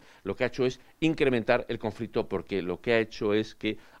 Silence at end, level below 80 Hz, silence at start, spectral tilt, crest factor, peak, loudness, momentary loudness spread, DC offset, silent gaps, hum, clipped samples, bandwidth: 0.2 s; -52 dBFS; 0.25 s; -6.5 dB/octave; 22 dB; -8 dBFS; -29 LUFS; 8 LU; under 0.1%; none; none; under 0.1%; 12 kHz